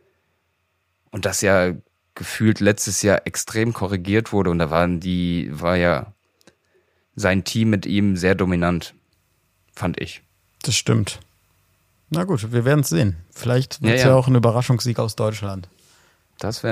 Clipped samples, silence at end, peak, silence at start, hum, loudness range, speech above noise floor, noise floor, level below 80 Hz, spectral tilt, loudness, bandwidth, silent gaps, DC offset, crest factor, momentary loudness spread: under 0.1%; 0 s; -2 dBFS; 1.15 s; none; 5 LU; 50 dB; -70 dBFS; -48 dBFS; -5.5 dB/octave; -20 LUFS; 15.5 kHz; none; under 0.1%; 20 dB; 13 LU